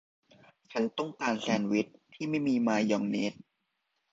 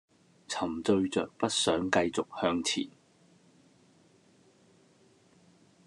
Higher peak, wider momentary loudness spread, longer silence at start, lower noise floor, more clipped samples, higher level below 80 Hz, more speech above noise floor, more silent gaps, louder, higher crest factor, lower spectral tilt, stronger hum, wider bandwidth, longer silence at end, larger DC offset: about the same, -12 dBFS vs -10 dBFS; about the same, 9 LU vs 7 LU; first, 0.7 s vs 0.5 s; first, -81 dBFS vs -63 dBFS; neither; second, -74 dBFS vs -68 dBFS; first, 51 dB vs 34 dB; neither; about the same, -31 LUFS vs -30 LUFS; about the same, 20 dB vs 24 dB; first, -5.5 dB/octave vs -3.5 dB/octave; neither; second, 7.8 kHz vs 12 kHz; second, 0.8 s vs 2.95 s; neither